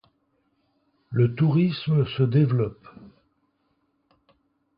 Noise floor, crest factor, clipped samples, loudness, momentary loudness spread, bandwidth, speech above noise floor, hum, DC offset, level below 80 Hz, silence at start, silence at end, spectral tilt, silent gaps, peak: -71 dBFS; 16 dB; under 0.1%; -23 LUFS; 7 LU; 5.2 kHz; 49 dB; none; under 0.1%; -58 dBFS; 1.1 s; 1.7 s; -12.5 dB/octave; none; -10 dBFS